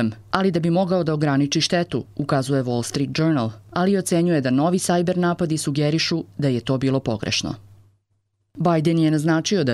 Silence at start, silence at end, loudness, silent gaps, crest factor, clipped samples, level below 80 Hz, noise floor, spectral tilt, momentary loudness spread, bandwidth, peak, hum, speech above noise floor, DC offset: 0 s; 0 s; -21 LUFS; none; 18 dB; under 0.1%; -54 dBFS; -70 dBFS; -5.5 dB/octave; 5 LU; 14 kHz; -4 dBFS; none; 49 dB; under 0.1%